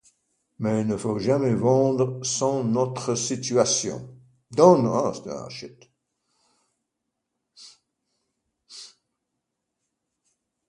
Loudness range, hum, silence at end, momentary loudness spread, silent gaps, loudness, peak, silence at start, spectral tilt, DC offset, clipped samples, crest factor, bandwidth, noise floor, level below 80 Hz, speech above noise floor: 9 LU; none; 1.85 s; 20 LU; none; -23 LUFS; -2 dBFS; 0.6 s; -5 dB/octave; under 0.1%; under 0.1%; 24 dB; 11.5 kHz; -81 dBFS; -64 dBFS; 59 dB